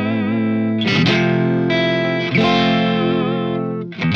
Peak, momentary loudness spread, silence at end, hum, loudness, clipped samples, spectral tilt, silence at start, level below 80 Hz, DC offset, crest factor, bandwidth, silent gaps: -4 dBFS; 6 LU; 0 s; none; -17 LUFS; under 0.1%; -7 dB/octave; 0 s; -54 dBFS; 0.3%; 14 dB; 7 kHz; none